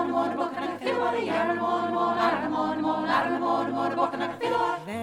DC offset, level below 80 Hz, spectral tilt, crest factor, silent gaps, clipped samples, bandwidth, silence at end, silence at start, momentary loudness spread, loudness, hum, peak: under 0.1%; -66 dBFS; -5.5 dB/octave; 16 dB; none; under 0.1%; 14 kHz; 0 s; 0 s; 4 LU; -26 LUFS; none; -10 dBFS